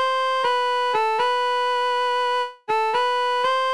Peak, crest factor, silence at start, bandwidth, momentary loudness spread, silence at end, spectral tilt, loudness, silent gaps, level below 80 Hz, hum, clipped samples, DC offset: -10 dBFS; 10 dB; 0 s; 11 kHz; 2 LU; 0 s; -0.5 dB/octave; -21 LUFS; none; -68 dBFS; none; under 0.1%; 0.4%